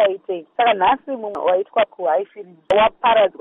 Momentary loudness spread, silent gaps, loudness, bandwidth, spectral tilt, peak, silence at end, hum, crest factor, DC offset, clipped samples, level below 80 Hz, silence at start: 12 LU; none; -19 LUFS; 5.6 kHz; -1 dB/octave; -4 dBFS; 0.1 s; none; 14 dB; under 0.1%; under 0.1%; -56 dBFS; 0 s